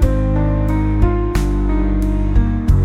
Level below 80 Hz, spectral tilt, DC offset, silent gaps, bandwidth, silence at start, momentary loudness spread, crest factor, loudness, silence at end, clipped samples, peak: -16 dBFS; -8.5 dB/octave; under 0.1%; none; 10 kHz; 0 s; 2 LU; 14 dB; -17 LUFS; 0 s; under 0.1%; 0 dBFS